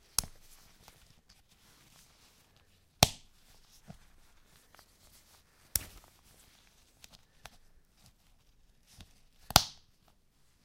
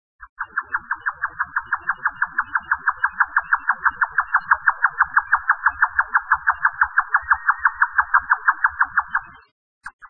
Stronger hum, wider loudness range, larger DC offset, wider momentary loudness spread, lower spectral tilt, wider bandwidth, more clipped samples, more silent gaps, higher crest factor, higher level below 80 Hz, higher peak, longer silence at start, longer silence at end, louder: neither; first, 9 LU vs 4 LU; second, under 0.1% vs 0.2%; first, 31 LU vs 8 LU; second, -2 dB/octave vs -4.5 dB/octave; first, 16 kHz vs 4.5 kHz; neither; second, none vs 0.29-0.36 s, 9.51-9.81 s, 9.93-9.99 s; first, 40 dB vs 20 dB; about the same, -54 dBFS vs -52 dBFS; about the same, 0 dBFS vs -2 dBFS; about the same, 0.2 s vs 0.2 s; first, 0.95 s vs 0.05 s; second, -30 LUFS vs -20 LUFS